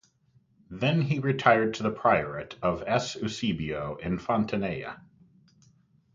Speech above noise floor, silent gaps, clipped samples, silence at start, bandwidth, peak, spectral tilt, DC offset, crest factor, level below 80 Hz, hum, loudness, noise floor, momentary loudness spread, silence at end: 38 dB; none; under 0.1%; 0.7 s; 7.6 kHz; -4 dBFS; -6 dB/octave; under 0.1%; 24 dB; -56 dBFS; none; -27 LUFS; -65 dBFS; 12 LU; 1.15 s